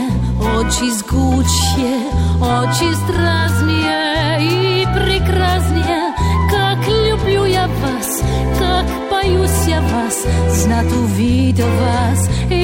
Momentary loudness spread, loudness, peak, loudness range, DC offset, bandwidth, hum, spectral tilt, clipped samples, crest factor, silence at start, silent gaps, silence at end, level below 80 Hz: 3 LU; -15 LUFS; -4 dBFS; 1 LU; under 0.1%; 16.5 kHz; none; -5 dB/octave; under 0.1%; 10 dB; 0 s; none; 0 s; -22 dBFS